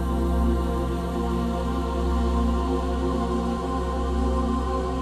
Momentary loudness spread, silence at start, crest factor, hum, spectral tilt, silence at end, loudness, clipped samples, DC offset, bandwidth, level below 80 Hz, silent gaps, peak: 3 LU; 0 s; 12 dB; none; -7.5 dB/octave; 0 s; -26 LUFS; under 0.1%; under 0.1%; 12.5 kHz; -28 dBFS; none; -12 dBFS